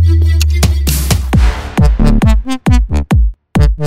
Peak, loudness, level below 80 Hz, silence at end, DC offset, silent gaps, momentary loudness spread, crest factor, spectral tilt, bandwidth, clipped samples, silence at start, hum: 0 dBFS; -12 LUFS; -12 dBFS; 0 s; under 0.1%; none; 3 LU; 10 dB; -6 dB/octave; 16.5 kHz; 0.3%; 0 s; none